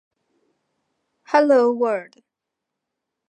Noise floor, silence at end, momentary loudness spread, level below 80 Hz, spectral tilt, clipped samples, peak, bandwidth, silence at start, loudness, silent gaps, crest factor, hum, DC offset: -83 dBFS; 1.3 s; 8 LU; -84 dBFS; -5 dB/octave; under 0.1%; -2 dBFS; 9 kHz; 1.3 s; -19 LUFS; none; 22 dB; none; under 0.1%